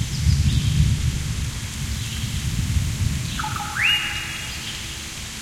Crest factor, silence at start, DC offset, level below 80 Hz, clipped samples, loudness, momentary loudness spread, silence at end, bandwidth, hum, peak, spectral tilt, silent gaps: 18 dB; 0 s; under 0.1%; -30 dBFS; under 0.1%; -23 LUFS; 10 LU; 0 s; 16.5 kHz; none; -6 dBFS; -3.5 dB/octave; none